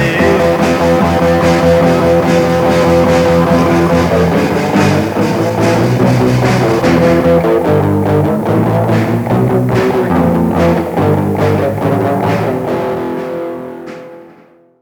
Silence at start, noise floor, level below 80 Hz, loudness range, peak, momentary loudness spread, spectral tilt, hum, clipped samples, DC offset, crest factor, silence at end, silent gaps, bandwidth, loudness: 0 s; -43 dBFS; -34 dBFS; 4 LU; 0 dBFS; 6 LU; -7 dB/octave; none; under 0.1%; under 0.1%; 10 dB; 0.55 s; none; over 20 kHz; -11 LUFS